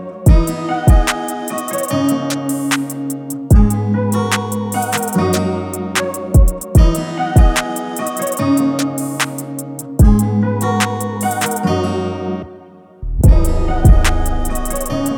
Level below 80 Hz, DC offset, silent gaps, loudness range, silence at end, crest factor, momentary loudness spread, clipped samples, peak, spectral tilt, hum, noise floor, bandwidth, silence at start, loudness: -18 dBFS; under 0.1%; none; 2 LU; 0 s; 14 dB; 10 LU; under 0.1%; 0 dBFS; -5.5 dB/octave; none; -39 dBFS; 19 kHz; 0 s; -16 LUFS